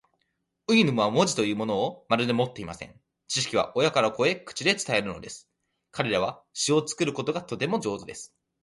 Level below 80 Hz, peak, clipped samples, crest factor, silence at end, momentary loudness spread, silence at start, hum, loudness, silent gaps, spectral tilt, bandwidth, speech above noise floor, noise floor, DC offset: -62 dBFS; -6 dBFS; under 0.1%; 20 dB; 0.35 s; 17 LU; 0.7 s; none; -26 LUFS; none; -4 dB/octave; 11.5 kHz; 51 dB; -77 dBFS; under 0.1%